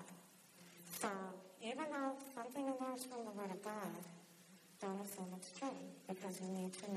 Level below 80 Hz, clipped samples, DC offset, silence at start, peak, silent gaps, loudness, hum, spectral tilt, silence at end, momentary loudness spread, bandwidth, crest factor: under -90 dBFS; under 0.1%; under 0.1%; 0 s; -28 dBFS; none; -47 LUFS; none; -4.5 dB/octave; 0 s; 17 LU; 14 kHz; 20 dB